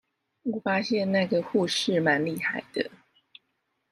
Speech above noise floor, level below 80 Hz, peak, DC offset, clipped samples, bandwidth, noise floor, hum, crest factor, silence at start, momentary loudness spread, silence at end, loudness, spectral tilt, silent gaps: 51 dB; -72 dBFS; -10 dBFS; under 0.1%; under 0.1%; 15.5 kHz; -77 dBFS; none; 18 dB; 0.45 s; 9 LU; 0.95 s; -27 LUFS; -5 dB/octave; none